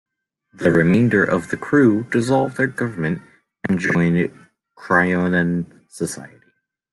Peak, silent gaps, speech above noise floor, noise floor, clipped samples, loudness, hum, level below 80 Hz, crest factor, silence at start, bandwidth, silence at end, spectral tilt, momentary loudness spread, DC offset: -2 dBFS; none; 45 dB; -63 dBFS; under 0.1%; -19 LUFS; none; -54 dBFS; 16 dB; 0.6 s; 12 kHz; 0.65 s; -7 dB/octave; 12 LU; under 0.1%